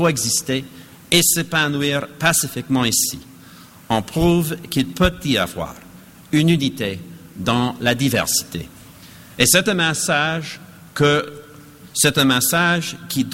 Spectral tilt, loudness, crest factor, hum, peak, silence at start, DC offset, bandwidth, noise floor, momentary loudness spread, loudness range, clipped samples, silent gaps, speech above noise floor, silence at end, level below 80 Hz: -3.5 dB/octave; -18 LUFS; 20 dB; none; 0 dBFS; 0 s; under 0.1%; 17 kHz; -43 dBFS; 17 LU; 3 LU; under 0.1%; none; 25 dB; 0 s; -42 dBFS